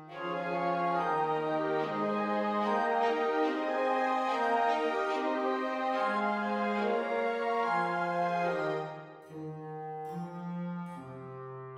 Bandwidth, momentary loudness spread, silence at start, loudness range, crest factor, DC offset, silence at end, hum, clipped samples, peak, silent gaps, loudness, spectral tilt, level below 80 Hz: 12 kHz; 13 LU; 0 s; 5 LU; 14 dB; under 0.1%; 0 s; none; under 0.1%; -18 dBFS; none; -31 LUFS; -6.5 dB/octave; -76 dBFS